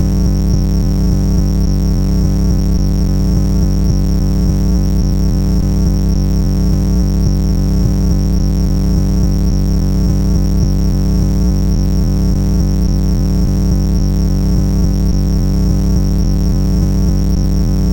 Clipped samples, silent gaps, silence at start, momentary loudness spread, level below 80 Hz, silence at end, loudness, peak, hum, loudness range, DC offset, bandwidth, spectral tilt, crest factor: under 0.1%; none; 0 s; 1 LU; -14 dBFS; 0 s; -14 LUFS; -2 dBFS; none; 0 LU; under 0.1%; 17 kHz; -7.5 dB/octave; 10 dB